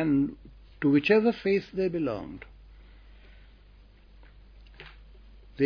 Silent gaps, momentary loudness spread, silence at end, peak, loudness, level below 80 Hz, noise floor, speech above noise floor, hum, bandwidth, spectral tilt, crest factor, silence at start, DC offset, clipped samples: none; 27 LU; 0 s; -10 dBFS; -26 LUFS; -52 dBFS; -54 dBFS; 28 dB; none; 5.4 kHz; -8.5 dB/octave; 20 dB; 0 s; under 0.1%; under 0.1%